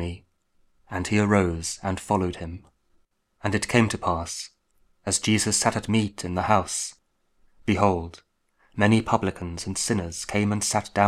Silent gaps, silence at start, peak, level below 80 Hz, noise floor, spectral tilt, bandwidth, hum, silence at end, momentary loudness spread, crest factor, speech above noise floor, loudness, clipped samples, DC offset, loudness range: none; 0 s; -2 dBFS; -48 dBFS; -65 dBFS; -4.5 dB/octave; 15 kHz; none; 0 s; 14 LU; 24 dB; 41 dB; -25 LUFS; under 0.1%; under 0.1%; 3 LU